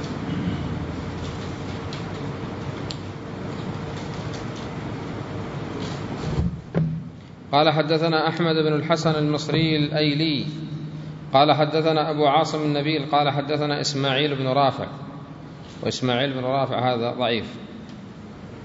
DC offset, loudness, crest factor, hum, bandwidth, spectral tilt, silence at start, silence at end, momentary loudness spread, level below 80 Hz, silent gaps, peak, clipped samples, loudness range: under 0.1%; -24 LUFS; 20 dB; none; 7.8 kHz; -6 dB/octave; 0 s; 0 s; 15 LU; -46 dBFS; none; -4 dBFS; under 0.1%; 10 LU